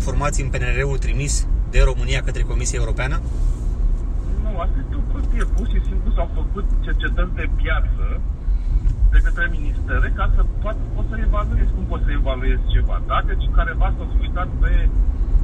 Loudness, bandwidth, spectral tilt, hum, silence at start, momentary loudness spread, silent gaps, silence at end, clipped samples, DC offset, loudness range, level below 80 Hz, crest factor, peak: -23 LUFS; 9.6 kHz; -5.5 dB/octave; none; 0 s; 5 LU; none; 0 s; under 0.1%; under 0.1%; 2 LU; -18 dBFS; 16 dB; -2 dBFS